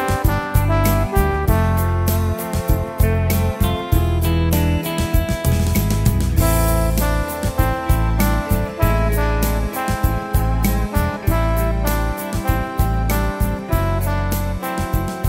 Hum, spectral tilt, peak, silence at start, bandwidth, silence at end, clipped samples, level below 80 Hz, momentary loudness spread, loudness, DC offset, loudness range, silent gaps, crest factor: none; -6 dB/octave; -2 dBFS; 0 s; 16.5 kHz; 0 s; under 0.1%; -22 dBFS; 4 LU; -19 LUFS; under 0.1%; 2 LU; none; 16 dB